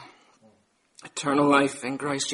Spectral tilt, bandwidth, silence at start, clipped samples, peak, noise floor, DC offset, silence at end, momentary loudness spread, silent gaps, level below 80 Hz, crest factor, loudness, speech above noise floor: -4 dB/octave; 11.5 kHz; 0 s; under 0.1%; -4 dBFS; -64 dBFS; under 0.1%; 0 s; 11 LU; none; -70 dBFS; 22 dB; -24 LUFS; 41 dB